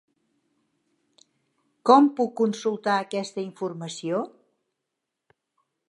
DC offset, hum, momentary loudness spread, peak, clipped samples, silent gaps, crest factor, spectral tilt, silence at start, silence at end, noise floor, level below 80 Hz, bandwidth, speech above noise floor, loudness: under 0.1%; none; 15 LU; -4 dBFS; under 0.1%; none; 24 dB; -5.5 dB/octave; 1.85 s; 1.6 s; -83 dBFS; -84 dBFS; 11 kHz; 60 dB; -24 LUFS